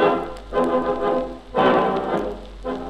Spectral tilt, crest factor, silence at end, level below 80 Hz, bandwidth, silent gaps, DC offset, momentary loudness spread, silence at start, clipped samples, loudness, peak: -6.5 dB/octave; 18 dB; 0 s; -42 dBFS; 11 kHz; none; under 0.1%; 11 LU; 0 s; under 0.1%; -22 LUFS; -4 dBFS